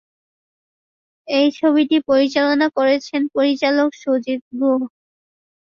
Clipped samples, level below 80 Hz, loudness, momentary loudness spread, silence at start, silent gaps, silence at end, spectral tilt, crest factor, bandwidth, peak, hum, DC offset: under 0.1%; -66 dBFS; -18 LUFS; 6 LU; 1.25 s; 4.42-4.51 s; 0.9 s; -4 dB/octave; 16 dB; 7.2 kHz; -4 dBFS; none; under 0.1%